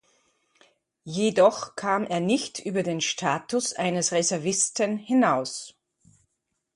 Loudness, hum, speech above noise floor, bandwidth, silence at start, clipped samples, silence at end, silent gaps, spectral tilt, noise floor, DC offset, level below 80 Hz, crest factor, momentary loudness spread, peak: -25 LUFS; none; 54 dB; 11.5 kHz; 1.05 s; under 0.1%; 1.05 s; none; -3.5 dB/octave; -79 dBFS; under 0.1%; -72 dBFS; 20 dB; 8 LU; -6 dBFS